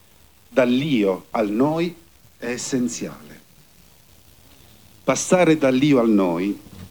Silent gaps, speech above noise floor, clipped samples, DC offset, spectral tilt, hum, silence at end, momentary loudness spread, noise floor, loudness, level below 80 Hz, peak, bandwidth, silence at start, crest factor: none; 34 dB; under 0.1%; 0.2%; -5 dB/octave; none; 0.05 s; 12 LU; -53 dBFS; -20 LUFS; -58 dBFS; -4 dBFS; over 20 kHz; 0.5 s; 18 dB